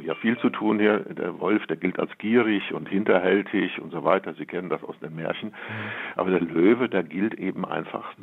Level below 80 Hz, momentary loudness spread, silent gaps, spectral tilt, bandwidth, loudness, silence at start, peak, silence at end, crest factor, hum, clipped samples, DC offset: -76 dBFS; 11 LU; none; -9 dB/octave; 4.1 kHz; -25 LUFS; 0 s; -4 dBFS; 0 s; 20 dB; none; under 0.1%; under 0.1%